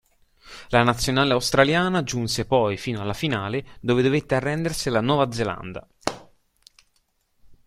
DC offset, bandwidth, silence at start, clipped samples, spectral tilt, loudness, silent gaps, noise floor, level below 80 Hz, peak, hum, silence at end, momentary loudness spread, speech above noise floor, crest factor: under 0.1%; 15.5 kHz; 0.45 s; under 0.1%; -5 dB/octave; -23 LUFS; none; -68 dBFS; -48 dBFS; -2 dBFS; none; 0.15 s; 12 LU; 46 dB; 22 dB